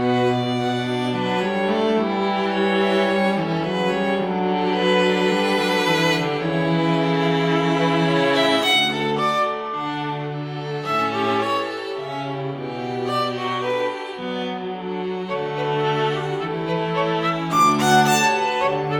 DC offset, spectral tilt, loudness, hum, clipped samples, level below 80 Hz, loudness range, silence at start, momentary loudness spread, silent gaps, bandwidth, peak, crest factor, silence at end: under 0.1%; -5 dB/octave; -21 LUFS; none; under 0.1%; -58 dBFS; 6 LU; 0 s; 10 LU; none; 18 kHz; -4 dBFS; 16 dB; 0 s